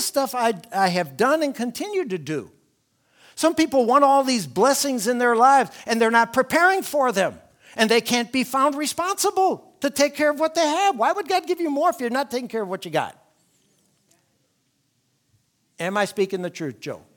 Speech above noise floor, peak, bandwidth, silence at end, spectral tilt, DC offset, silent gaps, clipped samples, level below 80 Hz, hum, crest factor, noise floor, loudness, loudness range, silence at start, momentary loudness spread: 48 dB; -2 dBFS; 19.5 kHz; 0.2 s; -3.5 dB/octave; under 0.1%; none; under 0.1%; -68 dBFS; none; 20 dB; -69 dBFS; -21 LUFS; 12 LU; 0 s; 11 LU